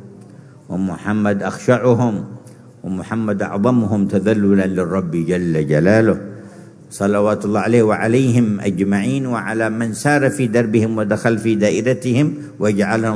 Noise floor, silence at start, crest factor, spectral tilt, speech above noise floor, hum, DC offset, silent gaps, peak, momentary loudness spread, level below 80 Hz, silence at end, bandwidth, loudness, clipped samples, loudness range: -40 dBFS; 0 s; 16 dB; -7 dB/octave; 24 dB; none; under 0.1%; none; 0 dBFS; 9 LU; -54 dBFS; 0 s; 11 kHz; -17 LUFS; under 0.1%; 2 LU